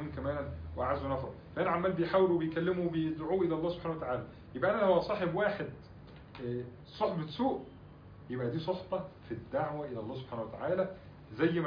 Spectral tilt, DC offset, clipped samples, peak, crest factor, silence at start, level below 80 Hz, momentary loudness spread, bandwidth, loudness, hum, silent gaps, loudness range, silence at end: -6 dB/octave; under 0.1%; under 0.1%; -16 dBFS; 18 dB; 0 s; -56 dBFS; 16 LU; 5.2 kHz; -34 LUFS; none; none; 6 LU; 0 s